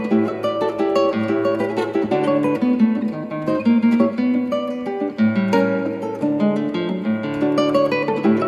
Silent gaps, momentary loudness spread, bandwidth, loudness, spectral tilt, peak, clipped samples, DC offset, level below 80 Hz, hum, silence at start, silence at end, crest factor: none; 6 LU; 10.5 kHz; -19 LUFS; -7.5 dB/octave; -2 dBFS; under 0.1%; under 0.1%; -64 dBFS; none; 0 s; 0 s; 16 dB